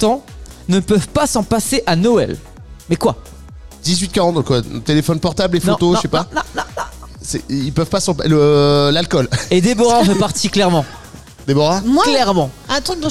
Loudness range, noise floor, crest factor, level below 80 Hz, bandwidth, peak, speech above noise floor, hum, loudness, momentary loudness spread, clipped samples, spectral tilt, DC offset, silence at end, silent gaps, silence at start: 4 LU; -36 dBFS; 12 dB; -38 dBFS; 15 kHz; -4 dBFS; 21 dB; none; -15 LUFS; 12 LU; under 0.1%; -5 dB/octave; 1%; 0 s; none; 0 s